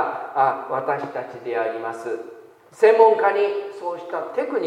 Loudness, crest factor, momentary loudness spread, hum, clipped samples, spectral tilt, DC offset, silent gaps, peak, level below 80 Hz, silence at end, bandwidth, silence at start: -21 LUFS; 20 dB; 16 LU; none; under 0.1%; -5.5 dB/octave; under 0.1%; none; -2 dBFS; -80 dBFS; 0 s; 10 kHz; 0 s